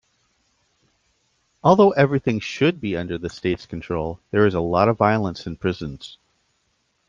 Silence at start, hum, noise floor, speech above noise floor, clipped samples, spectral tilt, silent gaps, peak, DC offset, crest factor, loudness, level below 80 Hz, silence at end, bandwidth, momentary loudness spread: 1.65 s; none; -69 dBFS; 49 dB; under 0.1%; -7 dB/octave; none; -2 dBFS; under 0.1%; 20 dB; -21 LUFS; -50 dBFS; 1 s; 7.4 kHz; 13 LU